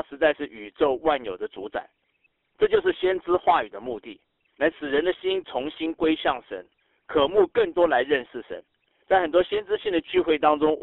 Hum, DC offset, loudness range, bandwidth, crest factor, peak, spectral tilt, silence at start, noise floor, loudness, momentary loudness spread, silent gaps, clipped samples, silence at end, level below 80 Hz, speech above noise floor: none; under 0.1%; 3 LU; 4.1 kHz; 18 dB; -6 dBFS; -7 dB/octave; 0.1 s; -70 dBFS; -24 LUFS; 14 LU; none; under 0.1%; 0 s; -56 dBFS; 46 dB